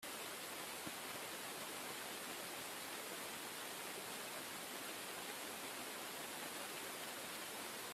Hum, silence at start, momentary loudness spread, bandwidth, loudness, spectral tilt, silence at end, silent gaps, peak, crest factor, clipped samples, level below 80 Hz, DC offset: none; 0 s; 0 LU; 16 kHz; -46 LUFS; -1 dB/octave; 0 s; none; -30 dBFS; 18 dB; under 0.1%; -84 dBFS; under 0.1%